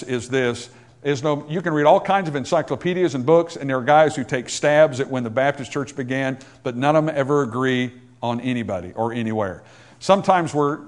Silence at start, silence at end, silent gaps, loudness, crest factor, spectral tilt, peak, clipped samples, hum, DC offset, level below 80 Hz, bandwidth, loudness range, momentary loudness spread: 0 s; 0 s; none; -21 LUFS; 20 dB; -5.5 dB/octave; 0 dBFS; under 0.1%; none; under 0.1%; -62 dBFS; 11 kHz; 4 LU; 12 LU